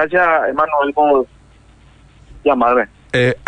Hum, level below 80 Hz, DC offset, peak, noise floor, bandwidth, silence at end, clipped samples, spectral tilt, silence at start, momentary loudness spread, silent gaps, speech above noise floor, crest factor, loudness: none; -46 dBFS; under 0.1%; -4 dBFS; -46 dBFS; 9.6 kHz; 0.1 s; under 0.1%; -6.5 dB/octave; 0 s; 6 LU; none; 32 dB; 12 dB; -15 LUFS